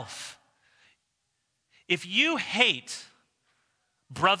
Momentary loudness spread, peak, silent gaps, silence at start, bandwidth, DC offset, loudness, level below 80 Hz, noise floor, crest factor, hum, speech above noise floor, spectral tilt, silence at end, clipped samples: 18 LU; -4 dBFS; none; 0 s; 11 kHz; under 0.1%; -25 LUFS; -72 dBFS; -78 dBFS; 26 dB; none; 51 dB; -2.5 dB/octave; 0 s; under 0.1%